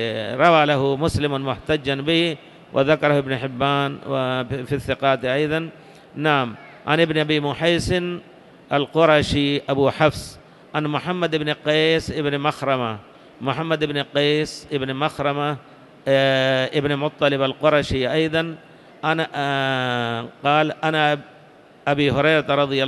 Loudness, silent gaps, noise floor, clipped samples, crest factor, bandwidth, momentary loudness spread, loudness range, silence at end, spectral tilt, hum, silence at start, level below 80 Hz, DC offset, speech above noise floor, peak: -21 LUFS; none; -48 dBFS; under 0.1%; 18 dB; 12.5 kHz; 9 LU; 3 LU; 0 s; -5.5 dB/octave; none; 0 s; -46 dBFS; under 0.1%; 28 dB; -4 dBFS